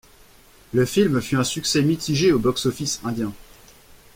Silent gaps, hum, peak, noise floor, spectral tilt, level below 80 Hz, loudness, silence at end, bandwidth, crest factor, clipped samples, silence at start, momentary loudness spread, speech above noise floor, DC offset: none; none; -6 dBFS; -51 dBFS; -5 dB/octave; -50 dBFS; -21 LUFS; 0.75 s; 16.5 kHz; 16 dB; under 0.1%; 0.75 s; 7 LU; 30 dB; under 0.1%